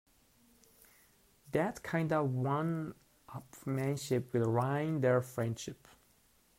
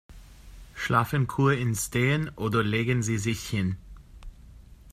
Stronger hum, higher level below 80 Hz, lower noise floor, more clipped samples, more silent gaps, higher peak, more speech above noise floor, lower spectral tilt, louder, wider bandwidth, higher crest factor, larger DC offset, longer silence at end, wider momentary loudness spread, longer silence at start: neither; second, -70 dBFS vs -48 dBFS; first, -69 dBFS vs -49 dBFS; neither; neither; second, -18 dBFS vs -6 dBFS; first, 35 dB vs 23 dB; first, -7 dB/octave vs -5.5 dB/octave; second, -34 LUFS vs -26 LUFS; about the same, 16 kHz vs 15 kHz; about the same, 18 dB vs 20 dB; neither; first, 0.85 s vs 0 s; first, 15 LU vs 7 LU; first, 1.5 s vs 0.1 s